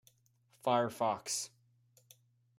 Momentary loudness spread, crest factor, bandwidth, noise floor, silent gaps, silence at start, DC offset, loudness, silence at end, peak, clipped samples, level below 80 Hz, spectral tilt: 7 LU; 22 dB; 16 kHz; -71 dBFS; none; 0.65 s; under 0.1%; -35 LUFS; 1.1 s; -16 dBFS; under 0.1%; -82 dBFS; -3.5 dB/octave